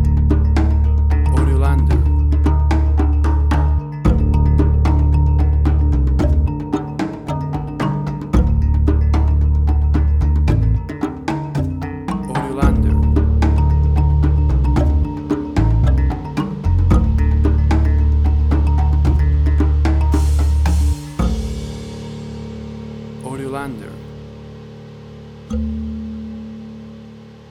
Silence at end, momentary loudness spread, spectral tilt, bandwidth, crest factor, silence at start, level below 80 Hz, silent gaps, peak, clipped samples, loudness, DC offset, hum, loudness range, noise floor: 0.15 s; 15 LU; -8.5 dB/octave; 7.4 kHz; 14 dB; 0 s; -16 dBFS; none; -2 dBFS; under 0.1%; -17 LUFS; under 0.1%; none; 13 LU; -38 dBFS